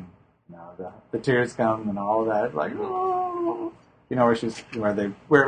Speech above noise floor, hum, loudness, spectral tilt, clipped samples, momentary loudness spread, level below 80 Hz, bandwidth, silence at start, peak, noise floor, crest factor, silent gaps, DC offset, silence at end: 26 dB; none; -25 LUFS; -6.5 dB/octave; under 0.1%; 16 LU; -60 dBFS; 9.8 kHz; 0 s; -2 dBFS; -50 dBFS; 24 dB; none; under 0.1%; 0 s